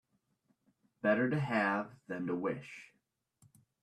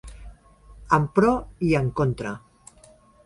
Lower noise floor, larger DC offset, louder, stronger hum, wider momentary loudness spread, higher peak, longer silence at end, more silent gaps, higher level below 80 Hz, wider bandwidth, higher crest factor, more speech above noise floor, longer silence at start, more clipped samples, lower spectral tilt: first, -81 dBFS vs -54 dBFS; neither; second, -34 LUFS vs -23 LUFS; neither; about the same, 13 LU vs 15 LU; second, -18 dBFS vs -4 dBFS; first, 1 s vs 0.85 s; neither; second, -78 dBFS vs -44 dBFS; about the same, 12 kHz vs 11.5 kHz; about the same, 20 dB vs 20 dB; first, 46 dB vs 32 dB; first, 1.05 s vs 0.05 s; neither; about the same, -7.5 dB/octave vs -7.5 dB/octave